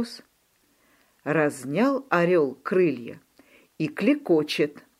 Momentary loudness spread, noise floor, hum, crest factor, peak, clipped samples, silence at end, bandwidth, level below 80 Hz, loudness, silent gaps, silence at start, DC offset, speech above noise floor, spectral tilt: 14 LU; -66 dBFS; none; 20 dB; -6 dBFS; under 0.1%; 0.2 s; 15.5 kHz; -76 dBFS; -24 LUFS; none; 0 s; under 0.1%; 42 dB; -6 dB/octave